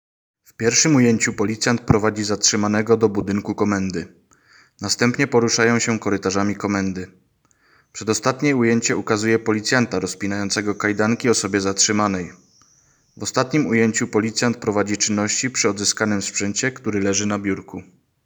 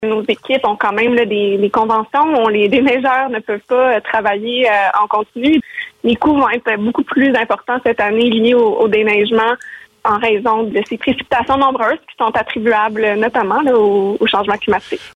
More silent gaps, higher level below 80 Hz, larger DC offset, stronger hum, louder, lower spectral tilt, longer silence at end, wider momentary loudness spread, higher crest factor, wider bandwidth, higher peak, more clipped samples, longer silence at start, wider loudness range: neither; about the same, -52 dBFS vs -50 dBFS; neither; neither; second, -19 LUFS vs -14 LUFS; second, -3.5 dB/octave vs -6 dB/octave; first, 0.45 s vs 0.05 s; first, 8 LU vs 5 LU; first, 20 dB vs 10 dB; first, over 20 kHz vs 9.8 kHz; first, 0 dBFS vs -4 dBFS; neither; first, 0.6 s vs 0 s; about the same, 3 LU vs 2 LU